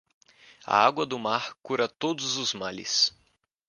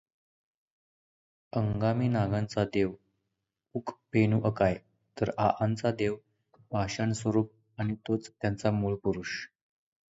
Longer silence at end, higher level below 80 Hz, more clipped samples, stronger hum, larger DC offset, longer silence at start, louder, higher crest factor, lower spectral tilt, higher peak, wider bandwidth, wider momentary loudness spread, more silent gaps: about the same, 0.6 s vs 0.65 s; second, -70 dBFS vs -56 dBFS; neither; neither; neither; second, 0.65 s vs 1.55 s; first, -26 LUFS vs -31 LUFS; about the same, 24 dB vs 20 dB; second, -2 dB/octave vs -7 dB/octave; first, -4 dBFS vs -12 dBFS; first, 11 kHz vs 8 kHz; second, 8 LU vs 11 LU; neither